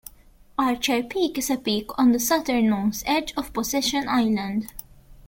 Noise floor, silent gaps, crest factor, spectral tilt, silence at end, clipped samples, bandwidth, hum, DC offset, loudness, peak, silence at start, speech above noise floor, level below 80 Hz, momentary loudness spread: -52 dBFS; none; 16 dB; -3.5 dB/octave; 0.15 s; under 0.1%; 17 kHz; none; under 0.1%; -23 LUFS; -8 dBFS; 0.6 s; 29 dB; -50 dBFS; 8 LU